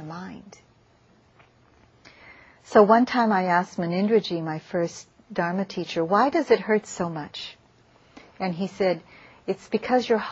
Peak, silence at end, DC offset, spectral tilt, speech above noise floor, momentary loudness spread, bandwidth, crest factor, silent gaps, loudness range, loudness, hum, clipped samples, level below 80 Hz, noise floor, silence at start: -2 dBFS; 0 s; under 0.1%; -6 dB/octave; 36 dB; 17 LU; 8.2 kHz; 22 dB; none; 5 LU; -24 LUFS; none; under 0.1%; -66 dBFS; -59 dBFS; 0 s